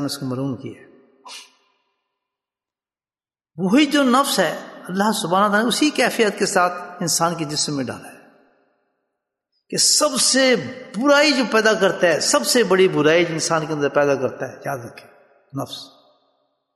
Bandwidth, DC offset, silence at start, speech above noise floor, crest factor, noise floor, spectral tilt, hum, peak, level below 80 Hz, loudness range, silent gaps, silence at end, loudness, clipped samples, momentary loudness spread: 12.5 kHz; under 0.1%; 0 s; over 71 dB; 18 dB; under -90 dBFS; -3 dB/octave; none; -2 dBFS; -68 dBFS; 8 LU; none; 0.9 s; -18 LUFS; under 0.1%; 17 LU